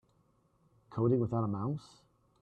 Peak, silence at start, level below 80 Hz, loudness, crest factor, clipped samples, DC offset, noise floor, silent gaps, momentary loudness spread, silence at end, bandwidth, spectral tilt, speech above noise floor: -18 dBFS; 0.9 s; -68 dBFS; -33 LUFS; 18 dB; under 0.1%; under 0.1%; -71 dBFS; none; 12 LU; 0.55 s; 8.8 kHz; -10.5 dB/octave; 39 dB